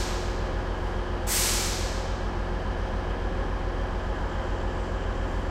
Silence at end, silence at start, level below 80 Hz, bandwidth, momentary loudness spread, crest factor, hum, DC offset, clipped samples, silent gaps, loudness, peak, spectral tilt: 0 s; 0 s; -30 dBFS; 16 kHz; 7 LU; 16 dB; none; under 0.1%; under 0.1%; none; -30 LUFS; -12 dBFS; -4 dB/octave